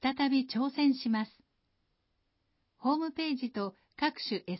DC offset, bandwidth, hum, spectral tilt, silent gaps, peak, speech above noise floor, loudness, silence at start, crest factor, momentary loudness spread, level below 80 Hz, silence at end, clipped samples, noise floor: under 0.1%; 5.8 kHz; none; -8.5 dB/octave; none; -18 dBFS; 47 dB; -32 LUFS; 0.05 s; 16 dB; 8 LU; -74 dBFS; 0 s; under 0.1%; -78 dBFS